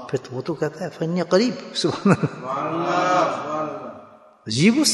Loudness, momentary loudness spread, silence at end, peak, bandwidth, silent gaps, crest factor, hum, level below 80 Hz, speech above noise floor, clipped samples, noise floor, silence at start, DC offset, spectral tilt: -22 LUFS; 10 LU; 0 s; -4 dBFS; 12 kHz; none; 18 dB; none; -64 dBFS; 25 dB; under 0.1%; -46 dBFS; 0 s; under 0.1%; -4.5 dB/octave